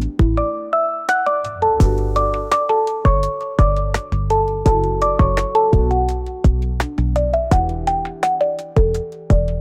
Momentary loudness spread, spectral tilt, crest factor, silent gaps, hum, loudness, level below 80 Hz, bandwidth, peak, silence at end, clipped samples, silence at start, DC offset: 5 LU; -7.5 dB/octave; 12 dB; none; none; -18 LUFS; -20 dBFS; 10.5 kHz; -4 dBFS; 0 s; under 0.1%; 0 s; under 0.1%